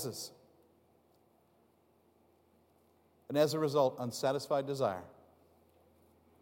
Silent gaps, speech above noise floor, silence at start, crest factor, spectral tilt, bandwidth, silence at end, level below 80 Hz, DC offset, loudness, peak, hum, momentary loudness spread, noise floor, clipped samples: none; 37 dB; 0 s; 22 dB; -5 dB/octave; 16.5 kHz; 1.3 s; -84 dBFS; under 0.1%; -34 LUFS; -16 dBFS; none; 15 LU; -70 dBFS; under 0.1%